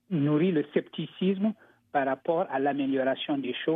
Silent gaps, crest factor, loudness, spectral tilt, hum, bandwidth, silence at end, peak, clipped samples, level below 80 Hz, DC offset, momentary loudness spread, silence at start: none; 16 dB; -28 LUFS; -10 dB/octave; none; 4.3 kHz; 0 s; -12 dBFS; under 0.1%; -84 dBFS; under 0.1%; 6 LU; 0.1 s